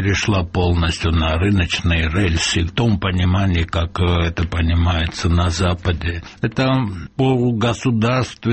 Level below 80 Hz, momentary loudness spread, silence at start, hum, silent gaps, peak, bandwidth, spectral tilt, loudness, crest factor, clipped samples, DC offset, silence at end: -28 dBFS; 4 LU; 0 s; none; none; -4 dBFS; 8.6 kHz; -5.5 dB/octave; -18 LUFS; 14 dB; under 0.1%; under 0.1%; 0 s